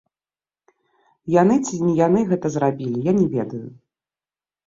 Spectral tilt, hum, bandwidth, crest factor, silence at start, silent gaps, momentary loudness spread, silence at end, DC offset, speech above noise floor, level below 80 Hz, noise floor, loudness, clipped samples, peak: -7.5 dB/octave; none; 7.8 kHz; 18 dB; 1.25 s; none; 15 LU; 0.95 s; under 0.1%; over 71 dB; -58 dBFS; under -90 dBFS; -20 LUFS; under 0.1%; -4 dBFS